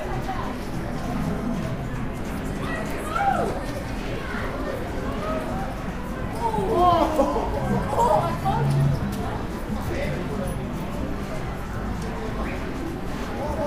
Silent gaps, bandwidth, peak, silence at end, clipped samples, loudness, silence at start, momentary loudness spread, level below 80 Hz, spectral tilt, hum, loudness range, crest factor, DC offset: none; 15.5 kHz; -6 dBFS; 0 s; under 0.1%; -26 LUFS; 0 s; 10 LU; -34 dBFS; -6.5 dB/octave; none; 7 LU; 20 dB; under 0.1%